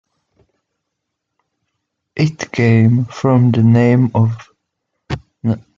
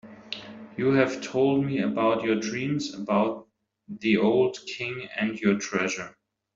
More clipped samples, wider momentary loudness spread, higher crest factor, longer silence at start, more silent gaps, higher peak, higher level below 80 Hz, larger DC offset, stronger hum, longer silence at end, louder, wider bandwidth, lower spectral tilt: neither; about the same, 16 LU vs 15 LU; about the same, 14 dB vs 18 dB; first, 2.15 s vs 0.05 s; neither; first, -2 dBFS vs -8 dBFS; first, -50 dBFS vs -64 dBFS; neither; neither; second, 0.2 s vs 0.45 s; first, -14 LUFS vs -26 LUFS; about the same, 7.2 kHz vs 7.8 kHz; first, -8 dB/octave vs -5.5 dB/octave